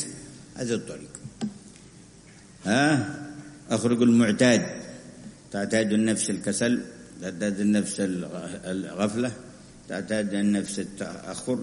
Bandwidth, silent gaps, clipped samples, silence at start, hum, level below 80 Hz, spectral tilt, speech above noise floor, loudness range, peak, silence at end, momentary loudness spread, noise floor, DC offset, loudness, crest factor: 11 kHz; none; under 0.1%; 0 s; none; -60 dBFS; -5 dB/octave; 25 dB; 5 LU; -6 dBFS; 0 s; 21 LU; -50 dBFS; under 0.1%; -26 LUFS; 22 dB